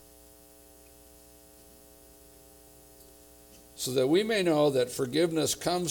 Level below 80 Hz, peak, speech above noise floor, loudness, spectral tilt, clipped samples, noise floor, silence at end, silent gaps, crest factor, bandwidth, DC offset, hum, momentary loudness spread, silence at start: -62 dBFS; -14 dBFS; 28 dB; -27 LUFS; -4 dB/octave; under 0.1%; -55 dBFS; 0 s; none; 18 dB; 19.5 kHz; under 0.1%; none; 6 LU; 3.75 s